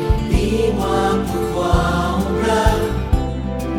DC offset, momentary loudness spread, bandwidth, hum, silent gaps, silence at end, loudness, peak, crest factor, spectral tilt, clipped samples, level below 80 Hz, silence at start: under 0.1%; 4 LU; 17.5 kHz; none; none; 0 s; -18 LUFS; -2 dBFS; 16 dB; -6.5 dB/octave; under 0.1%; -24 dBFS; 0 s